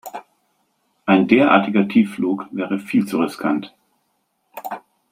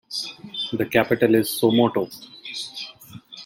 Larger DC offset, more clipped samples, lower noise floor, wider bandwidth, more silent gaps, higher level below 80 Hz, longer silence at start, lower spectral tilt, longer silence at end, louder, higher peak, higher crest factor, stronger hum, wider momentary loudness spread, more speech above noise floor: neither; neither; first, -69 dBFS vs -43 dBFS; about the same, 16 kHz vs 16.5 kHz; neither; about the same, -62 dBFS vs -62 dBFS; about the same, 0.05 s vs 0.1 s; first, -7 dB/octave vs -5 dB/octave; first, 0.35 s vs 0 s; first, -18 LUFS vs -22 LUFS; about the same, -2 dBFS vs -4 dBFS; about the same, 18 dB vs 20 dB; neither; first, 22 LU vs 16 LU; first, 51 dB vs 22 dB